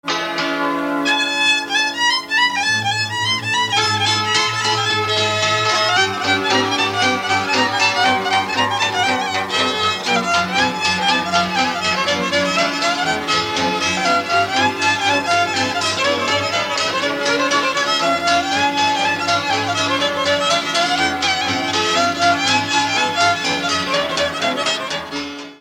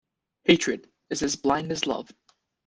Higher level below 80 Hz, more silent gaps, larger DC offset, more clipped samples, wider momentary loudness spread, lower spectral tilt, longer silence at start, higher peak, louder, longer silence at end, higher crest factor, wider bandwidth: about the same, -56 dBFS vs -58 dBFS; neither; neither; neither; second, 3 LU vs 13 LU; about the same, -2.5 dB/octave vs -3.5 dB/octave; second, 0.05 s vs 0.45 s; about the same, -2 dBFS vs -2 dBFS; first, -16 LUFS vs -26 LUFS; second, 0.05 s vs 0.65 s; second, 16 dB vs 24 dB; first, 16.5 kHz vs 10 kHz